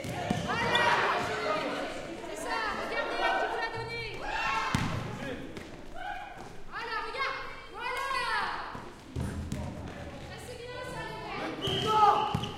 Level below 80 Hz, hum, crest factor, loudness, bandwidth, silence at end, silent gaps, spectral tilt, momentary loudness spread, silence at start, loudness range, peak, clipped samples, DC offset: -50 dBFS; none; 26 dB; -31 LUFS; 16.5 kHz; 0 s; none; -4.5 dB/octave; 16 LU; 0 s; 7 LU; -8 dBFS; under 0.1%; under 0.1%